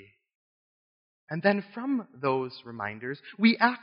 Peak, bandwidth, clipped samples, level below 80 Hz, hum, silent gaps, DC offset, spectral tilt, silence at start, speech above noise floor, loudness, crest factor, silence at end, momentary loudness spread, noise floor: -4 dBFS; 5.4 kHz; under 0.1%; -80 dBFS; none; none; under 0.1%; -3.5 dB/octave; 1.3 s; over 62 dB; -28 LUFS; 24 dB; 0 s; 15 LU; under -90 dBFS